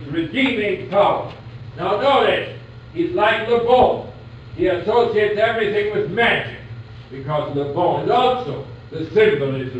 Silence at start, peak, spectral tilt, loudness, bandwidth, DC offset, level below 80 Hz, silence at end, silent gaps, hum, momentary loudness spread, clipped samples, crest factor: 0 s; -4 dBFS; -7 dB/octave; -18 LUFS; 8.4 kHz; under 0.1%; -48 dBFS; 0 s; none; none; 19 LU; under 0.1%; 16 dB